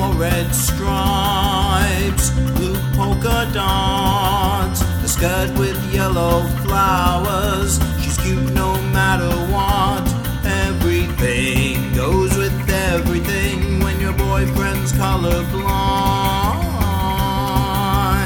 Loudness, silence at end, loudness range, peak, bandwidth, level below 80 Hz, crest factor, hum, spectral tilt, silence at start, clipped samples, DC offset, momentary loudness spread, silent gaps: -18 LUFS; 0 s; 1 LU; -2 dBFS; 19 kHz; -24 dBFS; 16 dB; none; -5 dB/octave; 0 s; under 0.1%; under 0.1%; 3 LU; none